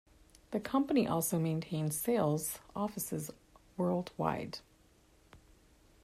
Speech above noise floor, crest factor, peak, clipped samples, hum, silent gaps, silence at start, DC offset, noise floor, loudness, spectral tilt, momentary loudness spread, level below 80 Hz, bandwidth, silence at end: 32 dB; 20 dB; -16 dBFS; under 0.1%; none; none; 0.5 s; under 0.1%; -66 dBFS; -35 LUFS; -5.5 dB/octave; 10 LU; -66 dBFS; 16 kHz; 0.65 s